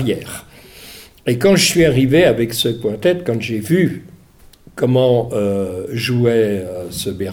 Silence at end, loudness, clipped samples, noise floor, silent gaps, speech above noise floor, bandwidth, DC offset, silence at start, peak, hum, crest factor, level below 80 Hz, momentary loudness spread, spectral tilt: 0 s; -16 LUFS; under 0.1%; -46 dBFS; none; 30 dB; 19 kHz; under 0.1%; 0 s; -2 dBFS; none; 14 dB; -44 dBFS; 17 LU; -5 dB/octave